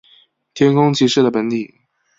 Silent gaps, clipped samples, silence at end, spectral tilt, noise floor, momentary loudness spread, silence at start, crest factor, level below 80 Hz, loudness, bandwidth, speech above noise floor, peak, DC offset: none; under 0.1%; 0.55 s; -6 dB/octave; -53 dBFS; 16 LU; 0.55 s; 16 dB; -58 dBFS; -15 LUFS; 7.8 kHz; 38 dB; -2 dBFS; under 0.1%